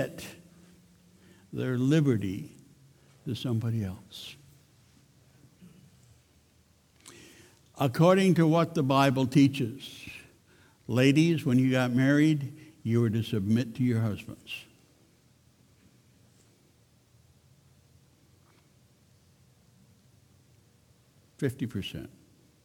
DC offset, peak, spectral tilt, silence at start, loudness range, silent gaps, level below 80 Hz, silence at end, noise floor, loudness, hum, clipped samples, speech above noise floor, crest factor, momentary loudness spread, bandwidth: under 0.1%; -10 dBFS; -7 dB/octave; 0 s; 15 LU; none; -66 dBFS; 0.55 s; -64 dBFS; -27 LUFS; none; under 0.1%; 38 dB; 20 dB; 21 LU; 17.5 kHz